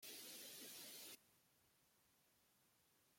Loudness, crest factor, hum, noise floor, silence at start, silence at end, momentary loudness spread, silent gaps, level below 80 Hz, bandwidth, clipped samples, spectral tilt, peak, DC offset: -55 LUFS; 18 dB; none; -79 dBFS; 0 s; 0 s; 5 LU; none; under -90 dBFS; 16.5 kHz; under 0.1%; 0 dB/octave; -44 dBFS; under 0.1%